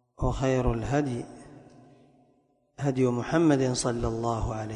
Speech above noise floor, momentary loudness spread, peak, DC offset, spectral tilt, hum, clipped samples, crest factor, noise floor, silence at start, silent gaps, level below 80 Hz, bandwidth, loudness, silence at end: 41 dB; 9 LU; -12 dBFS; under 0.1%; -6 dB/octave; none; under 0.1%; 16 dB; -67 dBFS; 0.2 s; none; -42 dBFS; 11 kHz; -27 LUFS; 0 s